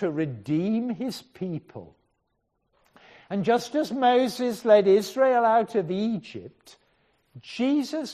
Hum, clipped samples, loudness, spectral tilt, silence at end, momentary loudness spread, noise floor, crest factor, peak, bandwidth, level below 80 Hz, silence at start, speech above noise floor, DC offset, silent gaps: none; under 0.1%; -24 LUFS; -6 dB/octave; 0 s; 16 LU; -75 dBFS; 20 dB; -6 dBFS; 14 kHz; -70 dBFS; 0 s; 51 dB; under 0.1%; none